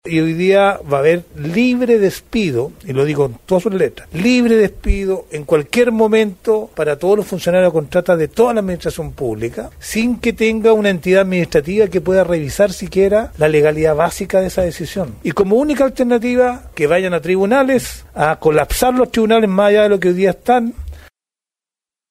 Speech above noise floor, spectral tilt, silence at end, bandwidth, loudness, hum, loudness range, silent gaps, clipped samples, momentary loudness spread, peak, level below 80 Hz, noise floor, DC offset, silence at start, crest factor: 76 dB; -6 dB/octave; 1.1 s; 16 kHz; -15 LUFS; none; 2 LU; none; under 0.1%; 8 LU; -2 dBFS; -34 dBFS; -90 dBFS; under 0.1%; 0.05 s; 14 dB